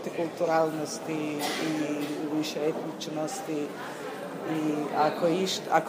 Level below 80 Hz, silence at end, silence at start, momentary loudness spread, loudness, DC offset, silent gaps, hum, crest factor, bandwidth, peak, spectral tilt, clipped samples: -80 dBFS; 0 s; 0 s; 9 LU; -30 LUFS; under 0.1%; none; none; 20 dB; 15.5 kHz; -8 dBFS; -4.5 dB/octave; under 0.1%